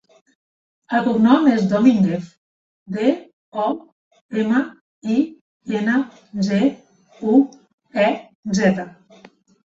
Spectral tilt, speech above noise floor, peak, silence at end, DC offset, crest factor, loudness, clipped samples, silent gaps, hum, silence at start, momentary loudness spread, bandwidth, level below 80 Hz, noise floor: -6.5 dB/octave; 31 dB; -2 dBFS; 0.85 s; under 0.1%; 18 dB; -19 LUFS; under 0.1%; 2.37-2.86 s, 3.33-3.52 s, 3.92-4.11 s, 4.21-4.29 s, 4.81-5.01 s, 5.41-5.60 s, 7.74-7.78 s, 8.35-8.43 s; none; 0.9 s; 15 LU; 7.8 kHz; -60 dBFS; -49 dBFS